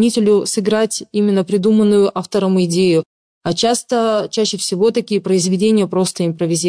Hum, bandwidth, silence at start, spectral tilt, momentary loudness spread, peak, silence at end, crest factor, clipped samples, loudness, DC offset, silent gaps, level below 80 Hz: none; 11 kHz; 0 s; -5 dB/octave; 5 LU; -4 dBFS; 0 s; 10 dB; under 0.1%; -16 LUFS; under 0.1%; 3.06-3.41 s; -58 dBFS